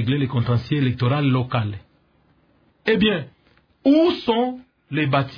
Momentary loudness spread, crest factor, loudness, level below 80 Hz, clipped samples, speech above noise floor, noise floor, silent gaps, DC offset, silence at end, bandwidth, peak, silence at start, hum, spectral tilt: 12 LU; 16 dB; -21 LUFS; -52 dBFS; under 0.1%; 40 dB; -60 dBFS; none; under 0.1%; 0 s; 5.2 kHz; -4 dBFS; 0 s; none; -9 dB/octave